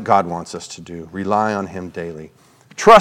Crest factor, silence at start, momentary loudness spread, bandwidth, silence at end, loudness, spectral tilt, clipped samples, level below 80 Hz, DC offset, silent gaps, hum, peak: 18 dB; 0 s; 15 LU; 15.5 kHz; 0 s; -19 LUFS; -4.5 dB/octave; 0.4%; -52 dBFS; under 0.1%; none; none; 0 dBFS